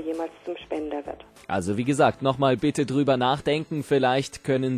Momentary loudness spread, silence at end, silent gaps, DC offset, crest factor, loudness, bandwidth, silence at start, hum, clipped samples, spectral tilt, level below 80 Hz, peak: 11 LU; 0 s; none; under 0.1%; 16 dB; -25 LUFS; 14.5 kHz; 0 s; none; under 0.1%; -6 dB/octave; -54 dBFS; -8 dBFS